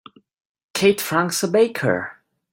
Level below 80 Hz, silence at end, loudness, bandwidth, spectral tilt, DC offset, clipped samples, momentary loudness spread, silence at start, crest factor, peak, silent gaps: -62 dBFS; 0.4 s; -20 LUFS; 16.5 kHz; -4 dB/octave; under 0.1%; under 0.1%; 9 LU; 0.75 s; 18 dB; -2 dBFS; none